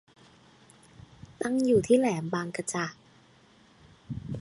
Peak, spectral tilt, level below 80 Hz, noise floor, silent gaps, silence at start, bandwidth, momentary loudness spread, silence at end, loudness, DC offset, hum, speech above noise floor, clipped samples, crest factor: -10 dBFS; -5.5 dB/octave; -60 dBFS; -59 dBFS; none; 1.3 s; 11.5 kHz; 16 LU; 0 s; -28 LUFS; under 0.1%; none; 33 dB; under 0.1%; 20 dB